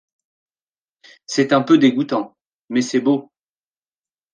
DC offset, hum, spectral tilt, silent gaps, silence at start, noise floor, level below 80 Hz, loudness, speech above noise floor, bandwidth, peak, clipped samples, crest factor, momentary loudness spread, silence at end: under 0.1%; none; -5 dB/octave; 2.53-2.68 s; 1.3 s; under -90 dBFS; -70 dBFS; -18 LUFS; over 73 dB; 9.8 kHz; -2 dBFS; under 0.1%; 18 dB; 10 LU; 1.1 s